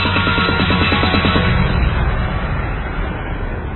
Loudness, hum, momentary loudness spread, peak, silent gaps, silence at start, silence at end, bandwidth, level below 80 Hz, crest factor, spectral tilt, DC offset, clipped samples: -17 LUFS; none; 10 LU; 0 dBFS; none; 0 s; 0 s; 4.3 kHz; -22 dBFS; 16 dB; -9 dB/octave; 0.3%; under 0.1%